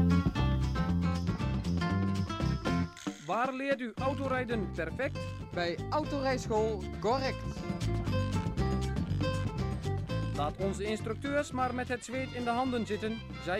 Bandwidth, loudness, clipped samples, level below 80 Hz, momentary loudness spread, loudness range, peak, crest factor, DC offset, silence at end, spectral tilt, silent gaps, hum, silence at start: 13 kHz; -33 LUFS; under 0.1%; -42 dBFS; 5 LU; 1 LU; -16 dBFS; 16 dB; under 0.1%; 0 s; -6.5 dB/octave; none; none; 0 s